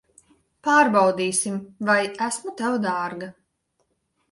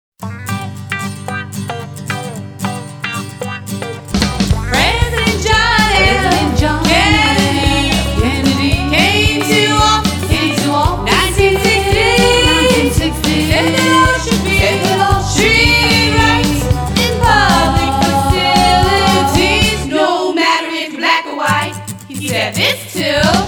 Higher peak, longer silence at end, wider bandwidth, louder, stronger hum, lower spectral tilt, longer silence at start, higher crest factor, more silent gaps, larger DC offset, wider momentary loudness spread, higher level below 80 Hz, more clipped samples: second, -6 dBFS vs 0 dBFS; first, 1 s vs 0 s; second, 11.5 kHz vs over 20 kHz; second, -22 LUFS vs -12 LUFS; neither; about the same, -3.5 dB/octave vs -4 dB/octave; first, 0.65 s vs 0.2 s; first, 18 dB vs 12 dB; neither; neither; about the same, 13 LU vs 13 LU; second, -70 dBFS vs -24 dBFS; neither